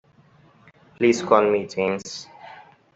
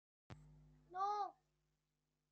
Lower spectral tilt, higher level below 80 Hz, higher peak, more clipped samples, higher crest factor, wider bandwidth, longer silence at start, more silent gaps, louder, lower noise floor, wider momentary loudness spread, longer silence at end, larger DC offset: about the same, -5 dB/octave vs -5 dB/octave; first, -66 dBFS vs -76 dBFS; first, -2 dBFS vs -30 dBFS; neither; about the same, 22 dB vs 18 dB; about the same, 8 kHz vs 8.2 kHz; first, 1 s vs 0.3 s; neither; first, -21 LUFS vs -45 LUFS; second, -55 dBFS vs -89 dBFS; first, 24 LU vs 21 LU; second, 0.35 s vs 1 s; neither